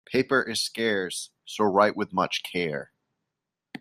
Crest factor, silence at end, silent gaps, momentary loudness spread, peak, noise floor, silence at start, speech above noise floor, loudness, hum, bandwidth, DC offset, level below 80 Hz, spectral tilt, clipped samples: 22 dB; 0.05 s; none; 13 LU; -6 dBFS; -85 dBFS; 0.1 s; 59 dB; -26 LUFS; none; 15.5 kHz; under 0.1%; -70 dBFS; -3.5 dB/octave; under 0.1%